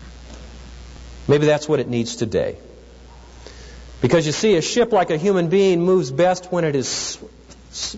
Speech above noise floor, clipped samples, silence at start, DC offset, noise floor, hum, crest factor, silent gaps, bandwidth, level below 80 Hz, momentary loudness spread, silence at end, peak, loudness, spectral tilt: 24 dB; under 0.1%; 0 s; under 0.1%; -42 dBFS; none; 16 dB; none; 8 kHz; -44 dBFS; 23 LU; 0 s; -6 dBFS; -19 LUFS; -5 dB/octave